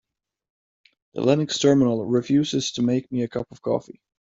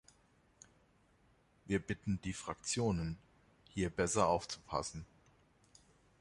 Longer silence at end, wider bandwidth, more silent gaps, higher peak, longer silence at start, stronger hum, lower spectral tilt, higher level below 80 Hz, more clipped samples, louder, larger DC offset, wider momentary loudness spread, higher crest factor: second, 0.4 s vs 1.15 s; second, 7.8 kHz vs 11.5 kHz; neither; first, -4 dBFS vs -16 dBFS; second, 1.15 s vs 1.65 s; neither; about the same, -5.5 dB/octave vs -4.5 dB/octave; about the same, -60 dBFS vs -58 dBFS; neither; first, -22 LUFS vs -38 LUFS; neither; second, 10 LU vs 14 LU; about the same, 20 dB vs 24 dB